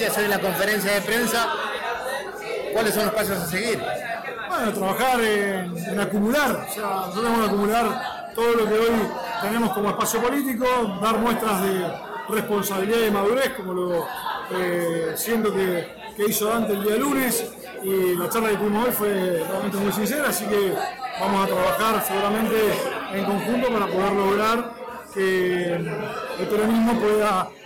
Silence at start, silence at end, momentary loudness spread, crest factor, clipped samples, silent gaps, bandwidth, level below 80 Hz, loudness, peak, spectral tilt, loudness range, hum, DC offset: 0 s; 0 s; 7 LU; 10 dB; under 0.1%; none; 17 kHz; -52 dBFS; -23 LUFS; -14 dBFS; -4 dB/octave; 2 LU; none; under 0.1%